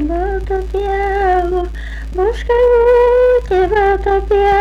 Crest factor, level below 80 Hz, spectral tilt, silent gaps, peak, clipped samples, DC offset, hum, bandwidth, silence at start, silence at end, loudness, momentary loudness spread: 8 dB; -24 dBFS; -7 dB/octave; none; -6 dBFS; under 0.1%; under 0.1%; none; 7.8 kHz; 0 s; 0 s; -14 LUFS; 10 LU